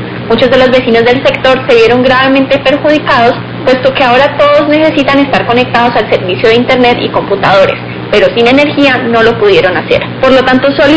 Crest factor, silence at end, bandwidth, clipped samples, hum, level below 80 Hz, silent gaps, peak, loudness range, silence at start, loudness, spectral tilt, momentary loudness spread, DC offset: 6 dB; 0 s; 8 kHz; 4%; none; -36 dBFS; none; 0 dBFS; 1 LU; 0 s; -7 LUFS; -6 dB/octave; 4 LU; 0.4%